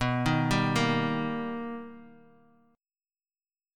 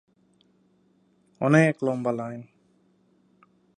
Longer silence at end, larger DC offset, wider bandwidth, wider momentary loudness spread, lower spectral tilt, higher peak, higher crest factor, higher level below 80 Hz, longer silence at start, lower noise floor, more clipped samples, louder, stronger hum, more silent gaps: first, 1.6 s vs 1.35 s; neither; first, 17 kHz vs 9.8 kHz; about the same, 14 LU vs 16 LU; second, -6 dB/octave vs -7.5 dB/octave; second, -12 dBFS vs -4 dBFS; second, 18 dB vs 24 dB; first, -52 dBFS vs -72 dBFS; second, 0 s vs 1.4 s; first, under -90 dBFS vs -64 dBFS; neither; second, -28 LUFS vs -24 LUFS; neither; neither